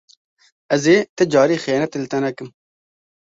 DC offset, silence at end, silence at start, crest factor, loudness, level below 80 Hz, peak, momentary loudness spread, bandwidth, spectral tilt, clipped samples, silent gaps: under 0.1%; 0.75 s; 0.7 s; 18 dB; -18 LUFS; -62 dBFS; -2 dBFS; 10 LU; 7.8 kHz; -5 dB/octave; under 0.1%; 1.09-1.17 s